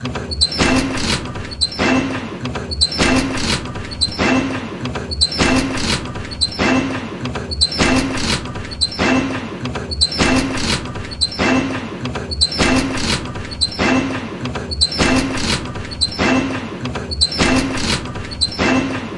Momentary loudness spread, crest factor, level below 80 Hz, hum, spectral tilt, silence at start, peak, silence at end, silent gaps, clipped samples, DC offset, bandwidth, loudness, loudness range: 10 LU; 16 dB; -32 dBFS; none; -3.5 dB/octave; 0 s; -2 dBFS; 0 s; none; under 0.1%; under 0.1%; 11.5 kHz; -17 LUFS; 1 LU